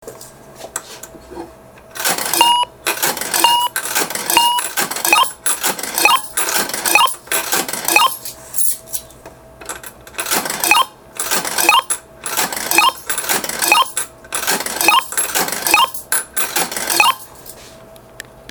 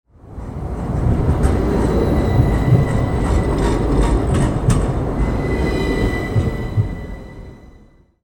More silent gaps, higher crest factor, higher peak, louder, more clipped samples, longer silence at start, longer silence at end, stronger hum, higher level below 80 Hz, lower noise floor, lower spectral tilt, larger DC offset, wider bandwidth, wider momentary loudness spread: neither; about the same, 18 dB vs 18 dB; about the same, 0 dBFS vs 0 dBFS; first, -15 LUFS vs -18 LUFS; neither; second, 0 s vs 0.25 s; second, 0 s vs 0.55 s; neither; second, -52 dBFS vs -22 dBFS; second, -40 dBFS vs -47 dBFS; second, 0.5 dB/octave vs -7.5 dB/octave; neither; first, over 20 kHz vs 18 kHz; first, 17 LU vs 14 LU